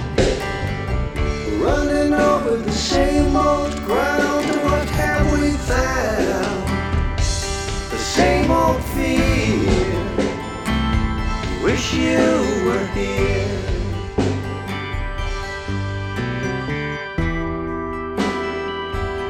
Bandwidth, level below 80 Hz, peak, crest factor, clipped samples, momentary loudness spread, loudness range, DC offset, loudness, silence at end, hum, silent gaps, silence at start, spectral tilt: 17.5 kHz; -28 dBFS; -2 dBFS; 18 dB; under 0.1%; 9 LU; 6 LU; under 0.1%; -20 LUFS; 0 s; none; none; 0 s; -5.5 dB/octave